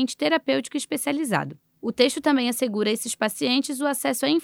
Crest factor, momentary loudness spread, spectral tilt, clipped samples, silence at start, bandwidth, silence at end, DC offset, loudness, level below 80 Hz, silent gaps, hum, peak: 18 dB; 5 LU; -3.5 dB/octave; under 0.1%; 0 s; 17.5 kHz; 0 s; under 0.1%; -24 LUFS; -72 dBFS; none; none; -6 dBFS